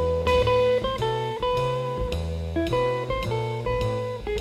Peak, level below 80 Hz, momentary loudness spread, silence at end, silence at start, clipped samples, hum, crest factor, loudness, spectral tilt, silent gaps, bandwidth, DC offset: -10 dBFS; -36 dBFS; 8 LU; 0 s; 0 s; under 0.1%; none; 14 dB; -25 LUFS; -6.5 dB/octave; none; 13.5 kHz; under 0.1%